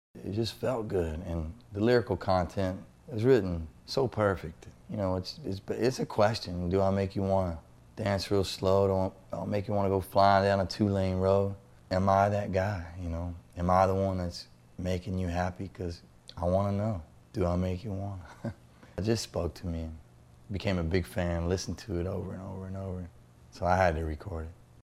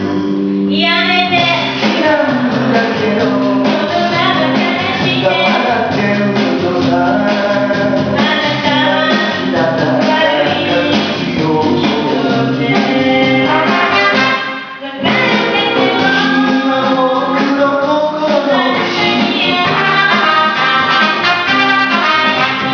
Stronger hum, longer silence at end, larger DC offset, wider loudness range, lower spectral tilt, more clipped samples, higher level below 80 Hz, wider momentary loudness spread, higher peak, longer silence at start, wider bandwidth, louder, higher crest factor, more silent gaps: neither; first, 0.45 s vs 0 s; neither; first, 6 LU vs 2 LU; about the same, -6.5 dB/octave vs -5.5 dB/octave; neither; about the same, -48 dBFS vs -50 dBFS; first, 15 LU vs 4 LU; second, -8 dBFS vs 0 dBFS; first, 0.15 s vs 0 s; first, 14 kHz vs 5.4 kHz; second, -30 LUFS vs -12 LUFS; first, 22 dB vs 12 dB; neither